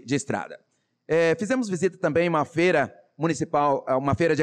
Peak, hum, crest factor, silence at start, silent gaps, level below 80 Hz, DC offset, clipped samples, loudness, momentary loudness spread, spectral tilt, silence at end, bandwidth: -12 dBFS; none; 12 dB; 0.05 s; none; -60 dBFS; under 0.1%; under 0.1%; -24 LUFS; 8 LU; -6 dB/octave; 0 s; 10.5 kHz